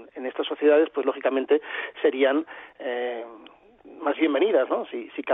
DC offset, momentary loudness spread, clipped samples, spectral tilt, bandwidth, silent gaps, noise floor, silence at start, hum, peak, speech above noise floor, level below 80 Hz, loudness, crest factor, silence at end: under 0.1%; 13 LU; under 0.1%; -7 dB/octave; 3.9 kHz; none; -50 dBFS; 0 s; none; -8 dBFS; 26 dB; -76 dBFS; -24 LUFS; 16 dB; 0 s